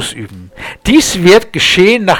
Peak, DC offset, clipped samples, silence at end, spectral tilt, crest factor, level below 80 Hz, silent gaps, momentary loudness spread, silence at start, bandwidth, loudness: 0 dBFS; under 0.1%; 0.6%; 0 s; -4 dB/octave; 10 dB; -34 dBFS; none; 20 LU; 0 s; 19 kHz; -8 LUFS